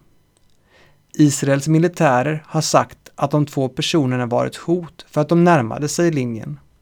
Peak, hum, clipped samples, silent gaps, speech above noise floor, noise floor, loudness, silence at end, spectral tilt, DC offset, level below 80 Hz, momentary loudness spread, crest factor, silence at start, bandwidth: 0 dBFS; none; under 0.1%; none; 39 dB; -56 dBFS; -18 LUFS; 0.25 s; -5.5 dB/octave; under 0.1%; -56 dBFS; 10 LU; 18 dB; 1.15 s; 18.5 kHz